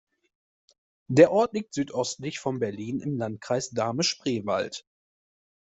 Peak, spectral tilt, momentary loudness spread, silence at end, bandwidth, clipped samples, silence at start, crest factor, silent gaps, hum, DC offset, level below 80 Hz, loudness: -4 dBFS; -5 dB/octave; 12 LU; 0.85 s; 8.2 kHz; under 0.1%; 1.1 s; 24 dB; none; none; under 0.1%; -66 dBFS; -26 LUFS